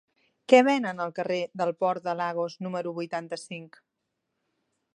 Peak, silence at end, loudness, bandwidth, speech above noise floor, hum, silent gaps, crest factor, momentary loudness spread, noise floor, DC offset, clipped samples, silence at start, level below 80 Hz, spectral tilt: -4 dBFS; 1.3 s; -27 LUFS; 10.5 kHz; 55 dB; none; none; 24 dB; 17 LU; -82 dBFS; under 0.1%; under 0.1%; 0.5 s; -82 dBFS; -5.5 dB/octave